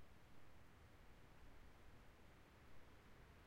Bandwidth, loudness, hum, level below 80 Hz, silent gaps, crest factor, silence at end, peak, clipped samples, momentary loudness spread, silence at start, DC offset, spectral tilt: 16 kHz; -68 LUFS; none; -70 dBFS; none; 12 dB; 0 s; -50 dBFS; under 0.1%; 1 LU; 0 s; under 0.1%; -5 dB/octave